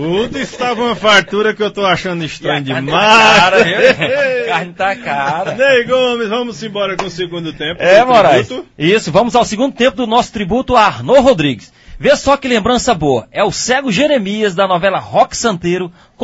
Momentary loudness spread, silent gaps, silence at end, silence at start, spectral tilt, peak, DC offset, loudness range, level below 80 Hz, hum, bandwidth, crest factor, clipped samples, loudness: 10 LU; none; 0 s; 0 s; -4 dB/octave; 0 dBFS; under 0.1%; 4 LU; -40 dBFS; none; 11 kHz; 12 dB; 0.2%; -12 LUFS